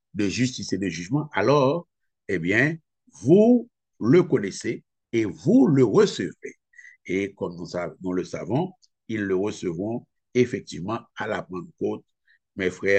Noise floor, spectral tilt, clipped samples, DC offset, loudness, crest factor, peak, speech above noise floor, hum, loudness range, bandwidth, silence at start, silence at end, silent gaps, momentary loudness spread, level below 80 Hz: -51 dBFS; -6.5 dB/octave; under 0.1%; under 0.1%; -24 LUFS; 18 dB; -6 dBFS; 28 dB; none; 8 LU; 8.8 kHz; 0.15 s; 0 s; none; 15 LU; -64 dBFS